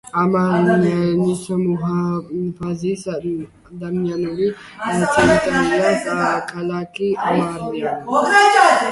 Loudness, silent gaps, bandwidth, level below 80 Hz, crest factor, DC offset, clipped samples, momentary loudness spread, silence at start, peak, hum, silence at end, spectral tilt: -18 LUFS; none; 11.5 kHz; -48 dBFS; 18 dB; under 0.1%; under 0.1%; 12 LU; 0.05 s; 0 dBFS; none; 0 s; -5.5 dB/octave